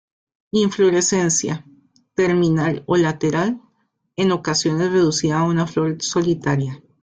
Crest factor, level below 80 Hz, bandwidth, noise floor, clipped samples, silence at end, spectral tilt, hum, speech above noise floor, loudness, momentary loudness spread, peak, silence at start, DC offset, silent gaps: 14 dB; -54 dBFS; 9.6 kHz; -67 dBFS; under 0.1%; 0.25 s; -5 dB/octave; none; 49 dB; -19 LUFS; 8 LU; -6 dBFS; 0.55 s; under 0.1%; none